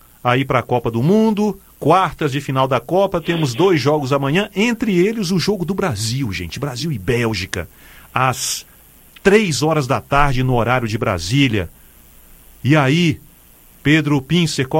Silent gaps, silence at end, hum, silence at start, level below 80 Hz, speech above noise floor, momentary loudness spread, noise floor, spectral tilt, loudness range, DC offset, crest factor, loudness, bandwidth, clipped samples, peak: none; 0 s; none; 0.25 s; -36 dBFS; 30 dB; 8 LU; -47 dBFS; -5.5 dB/octave; 4 LU; under 0.1%; 18 dB; -17 LUFS; 17 kHz; under 0.1%; 0 dBFS